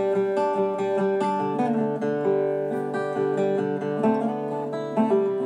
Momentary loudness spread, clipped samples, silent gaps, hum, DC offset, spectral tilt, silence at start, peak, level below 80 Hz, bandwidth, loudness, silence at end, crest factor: 4 LU; under 0.1%; none; none; under 0.1%; -8 dB/octave; 0 s; -10 dBFS; -82 dBFS; 10 kHz; -25 LUFS; 0 s; 14 dB